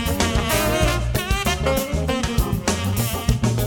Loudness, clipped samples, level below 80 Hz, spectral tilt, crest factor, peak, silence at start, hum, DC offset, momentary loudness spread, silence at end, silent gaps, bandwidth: -21 LUFS; under 0.1%; -26 dBFS; -4.5 dB/octave; 20 dB; -2 dBFS; 0 s; none; under 0.1%; 3 LU; 0 s; none; 18 kHz